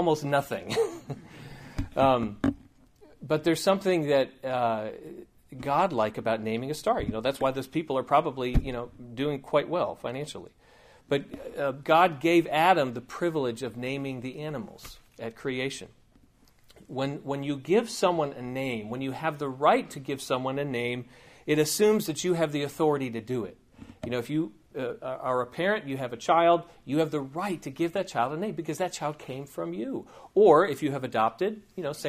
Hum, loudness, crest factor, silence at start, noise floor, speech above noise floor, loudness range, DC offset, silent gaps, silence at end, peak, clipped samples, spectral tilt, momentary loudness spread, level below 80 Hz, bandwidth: none; -28 LUFS; 22 dB; 0 s; -60 dBFS; 32 dB; 6 LU; under 0.1%; none; 0 s; -6 dBFS; under 0.1%; -5.5 dB/octave; 15 LU; -48 dBFS; 15.5 kHz